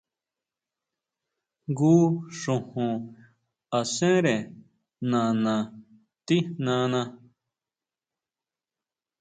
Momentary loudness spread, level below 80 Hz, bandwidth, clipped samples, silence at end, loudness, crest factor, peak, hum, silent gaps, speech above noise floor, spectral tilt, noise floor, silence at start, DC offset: 16 LU; -70 dBFS; 9.4 kHz; under 0.1%; 2.05 s; -26 LUFS; 18 dB; -10 dBFS; none; none; over 66 dB; -6 dB/octave; under -90 dBFS; 1.7 s; under 0.1%